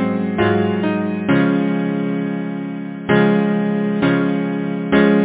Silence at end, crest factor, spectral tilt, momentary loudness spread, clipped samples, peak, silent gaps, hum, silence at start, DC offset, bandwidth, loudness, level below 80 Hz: 0 s; 16 dB; -11.5 dB/octave; 8 LU; under 0.1%; 0 dBFS; none; none; 0 s; under 0.1%; 4 kHz; -18 LUFS; -50 dBFS